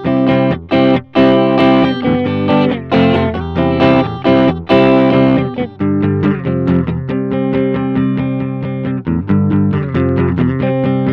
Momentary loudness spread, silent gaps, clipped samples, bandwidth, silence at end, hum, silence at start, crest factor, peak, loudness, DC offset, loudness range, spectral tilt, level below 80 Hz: 8 LU; none; under 0.1%; 5.8 kHz; 0 s; none; 0 s; 12 dB; 0 dBFS; -13 LUFS; under 0.1%; 4 LU; -9.5 dB/octave; -40 dBFS